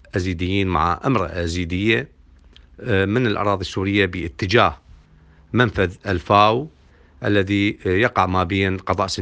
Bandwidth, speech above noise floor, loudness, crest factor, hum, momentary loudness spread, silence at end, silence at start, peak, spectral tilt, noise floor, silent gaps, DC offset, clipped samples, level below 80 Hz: 9.4 kHz; 31 dB; -20 LUFS; 20 dB; none; 8 LU; 0 s; 0.15 s; 0 dBFS; -6 dB/octave; -50 dBFS; none; under 0.1%; under 0.1%; -44 dBFS